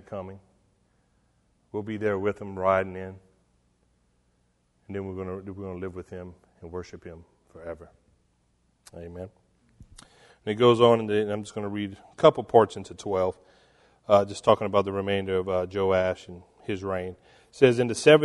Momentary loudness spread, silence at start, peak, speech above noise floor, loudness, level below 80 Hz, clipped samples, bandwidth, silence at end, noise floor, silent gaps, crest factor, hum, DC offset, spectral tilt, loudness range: 21 LU; 0.1 s; -2 dBFS; 44 dB; -25 LUFS; -62 dBFS; under 0.1%; 11.5 kHz; 0 s; -69 dBFS; none; 24 dB; 60 Hz at -60 dBFS; under 0.1%; -6 dB/octave; 20 LU